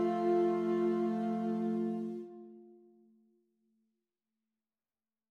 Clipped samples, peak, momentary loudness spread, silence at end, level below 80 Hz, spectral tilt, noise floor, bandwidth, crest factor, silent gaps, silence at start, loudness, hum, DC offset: under 0.1%; -22 dBFS; 18 LU; 2.65 s; under -90 dBFS; -8.5 dB/octave; under -90 dBFS; 6.6 kHz; 14 dB; none; 0 s; -33 LUFS; none; under 0.1%